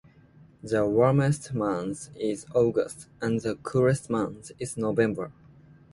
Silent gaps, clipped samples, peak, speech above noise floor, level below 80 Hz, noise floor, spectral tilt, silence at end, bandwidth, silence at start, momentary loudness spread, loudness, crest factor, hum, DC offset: none; under 0.1%; -8 dBFS; 29 dB; -58 dBFS; -55 dBFS; -7 dB/octave; 0.6 s; 11.5 kHz; 0.65 s; 13 LU; -27 LUFS; 20 dB; none; under 0.1%